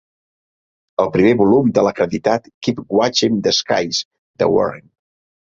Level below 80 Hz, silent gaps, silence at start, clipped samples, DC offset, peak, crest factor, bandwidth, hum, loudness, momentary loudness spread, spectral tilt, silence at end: -52 dBFS; 2.54-2.61 s, 4.05-4.11 s, 4.19-4.34 s; 1 s; under 0.1%; under 0.1%; -2 dBFS; 16 dB; 7.6 kHz; none; -17 LUFS; 10 LU; -5 dB/octave; 0.7 s